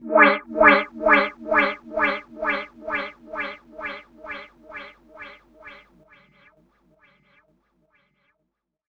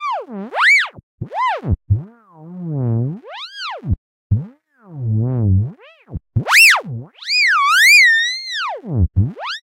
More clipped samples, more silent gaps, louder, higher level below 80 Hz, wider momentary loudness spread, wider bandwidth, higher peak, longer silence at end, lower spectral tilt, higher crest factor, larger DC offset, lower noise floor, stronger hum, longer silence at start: neither; second, none vs 1.03-1.18 s, 3.98-4.30 s; second, -20 LUFS vs -14 LUFS; second, -56 dBFS vs -36 dBFS; first, 24 LU vs 20 LU; second, 6.8 kHz vs 16 kHz; about the same, -2 dBFS vs 0 dBFS; first, 3.15 s vs 0 s; first, -6 dB/octave vs -3.5 dB/octave; first, 22 dB vs 16 dB; neither; first, -78 dBFS vs -41 dBFS; neither; about the same, 0 s vs 0 s